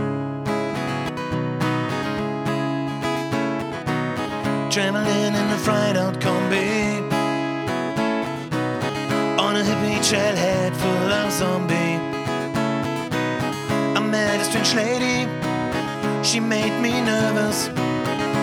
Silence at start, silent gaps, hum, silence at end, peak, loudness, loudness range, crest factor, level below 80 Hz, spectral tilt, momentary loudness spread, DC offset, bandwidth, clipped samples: 0 s; none; none; 0 s; -2 dBFS; -22 LUFS; 4 LU; 20 dB; -52 dBFS; -4.5 dB/octave; 6 LU; under 0.1%; 19.5 kHz; under 0.1%